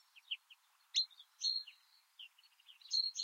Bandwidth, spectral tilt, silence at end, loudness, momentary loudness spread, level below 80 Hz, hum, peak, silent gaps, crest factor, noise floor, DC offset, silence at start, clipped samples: 16 kHz; 9.5 dB/octave; 0 s; -39 LUFS; 20 LU; under -90 dBFS; none; -24 dBFS; none; 20 dB; -68 dBFS; under 0.1%; 0.15 s; under 0.1%